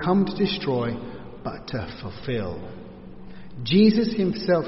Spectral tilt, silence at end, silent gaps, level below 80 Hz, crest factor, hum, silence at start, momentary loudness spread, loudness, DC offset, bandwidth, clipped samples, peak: -5.5 dB/octave; 0 s; none; -48 dBFS; 18 dB; none; 0 s; 24 LU; -24 LUFS; under 0.1%; 6 kHz; under 0.1%; -6 dBFS